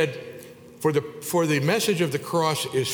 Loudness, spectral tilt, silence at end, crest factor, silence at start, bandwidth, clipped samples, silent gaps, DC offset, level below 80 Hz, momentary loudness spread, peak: -24 LUFS; -4.5 dB/octave; 0 s; 18 dB; 0 s; over 20 kHz; under 0.1%; none; under 0.1%; -66 dBFS; 12 LU; -8 dBFS